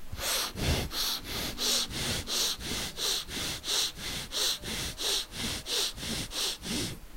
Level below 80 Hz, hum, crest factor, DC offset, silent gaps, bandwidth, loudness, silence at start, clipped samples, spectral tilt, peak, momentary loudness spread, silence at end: -44 dBFS; none; 18 dB; under 0.1%; none; 16 kHz; -30 LUFS; 0 s; under 0.1%; -1.5 dB/octave; -14 dBFS; 6 LU; 0 s